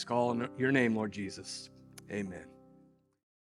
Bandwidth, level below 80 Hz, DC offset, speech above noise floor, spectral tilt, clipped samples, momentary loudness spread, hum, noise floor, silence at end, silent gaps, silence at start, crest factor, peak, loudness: 12.5 kHz; -72 dBFS; under 0.1%; 31 dB; -5.5 dB/octave; under 0.1%; 19 LU; none; -64 dBFS; 0.9 s; none; 0 s; 22 dB; -14 dBFS; -34 LUFS